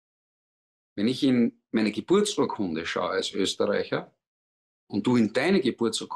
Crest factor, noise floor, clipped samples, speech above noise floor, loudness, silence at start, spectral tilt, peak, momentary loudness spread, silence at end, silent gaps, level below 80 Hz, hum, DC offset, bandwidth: 14 dB; under -90 dBFS; under 0.1%; over 65 dB; -26 LUFS; 0.95 s; -5 dB/octave; -12 dBFS; 7 LU; 0 s; 4.27-4.87 s; -68 dBFS; none; under 0.1%; 12.5 kHz